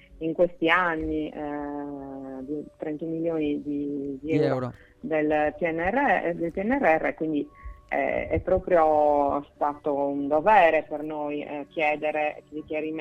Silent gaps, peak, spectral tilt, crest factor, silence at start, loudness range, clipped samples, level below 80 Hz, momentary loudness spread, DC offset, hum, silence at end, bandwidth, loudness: none; -6 dBFS; -7.5 dB/octave; 20 dB; 0.1 s; 7 LU; under 0.1%; -50 dBFS; 13 LU; under 0.1%; none; 0 s; 7.8 kHz; -25 LUFS